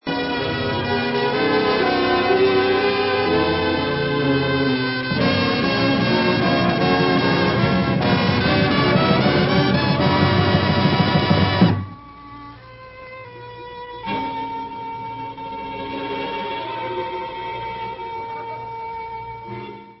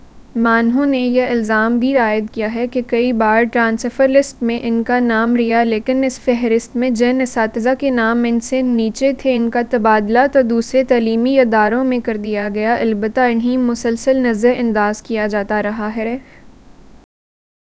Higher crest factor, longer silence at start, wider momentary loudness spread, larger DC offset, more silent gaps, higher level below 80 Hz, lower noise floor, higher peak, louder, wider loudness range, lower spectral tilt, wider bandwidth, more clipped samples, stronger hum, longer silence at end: about the same, 18 dB vs 16 dB; about the same, 0.05 s vs 0.15 s; first, 17 LU vs 6 LU; neither; neither; first, -40 dBFS vs -46 dBFS; about the same, -40 dBFS vs -41 dBFS; about the same, -2 dBFS vs 0 dBFS; second, -19 LUFS vs -15 LUFS; first, 12 LU vs 2 LU; first, -10 dB/octave vs -5.5 dB/octave; second, 5.8 kHz vs 8 kHz; neither; neither; second, 0.05 s vs 1.15 s